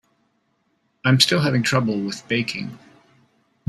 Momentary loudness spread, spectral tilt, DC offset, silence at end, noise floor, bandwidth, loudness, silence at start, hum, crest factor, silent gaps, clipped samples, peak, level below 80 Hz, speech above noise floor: 12 LU; -4.5 dB/octave; under 0.1%; 0.9 s; -68 dBFS; 14 kHz; -20 LUFS; 1.05 s; none; 24 dB; none; under 0.1%; 0 dBFS; -60 dBFS; 48 dB